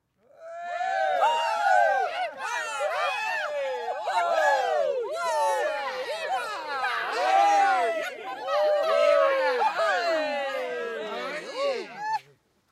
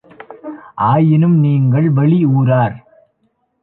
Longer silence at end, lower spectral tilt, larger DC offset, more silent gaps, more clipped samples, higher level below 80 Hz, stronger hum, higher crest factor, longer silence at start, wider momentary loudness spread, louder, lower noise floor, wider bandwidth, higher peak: second, 0.5 s vs 0.85 s; second, -1 dB/octave vs -12.5 dB/octave; neither; neither; neither; second, -80 dBFS vs -52 dBFS; neither; about the same, 16 dB vs 12 dB; about the same, 0.4 s vs 0.3 s; second, 11 LU vs 19 LU; second, -26 LUFS vs -13 LUFS; about the same, -61 dBFS vs -64 dBFS; first, 15 kHz vs 4 kHz; second, -10 dBFS vs -2 dBFS